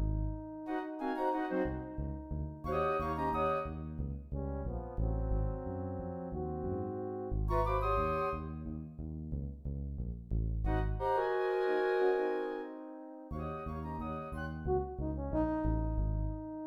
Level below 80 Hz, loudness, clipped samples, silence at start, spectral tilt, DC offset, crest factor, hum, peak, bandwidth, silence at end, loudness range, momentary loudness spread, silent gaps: -42 dBFS; -36 LUFS; under 0.1%; 0 s; -9 dB/octave; under 0.1%; 16 dB; none; -20 dBFS; 6 kHz; 0 s; 4 LU; 10 LU; none